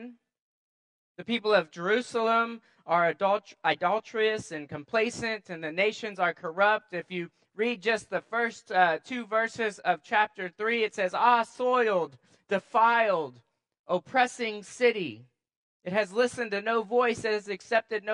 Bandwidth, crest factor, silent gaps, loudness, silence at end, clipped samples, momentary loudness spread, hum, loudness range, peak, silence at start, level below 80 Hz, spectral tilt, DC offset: 11 kHz; 20 dB; 0.39-1.15 s, 13.79-13.84 s, 15.57-15.80 s; -28 LUFS; 0 s; under 0.1%; 10 LU; none; 3 LU; -8 dBFS; 0 s; -74 dBFS; -4 dB/octave; under 0.1%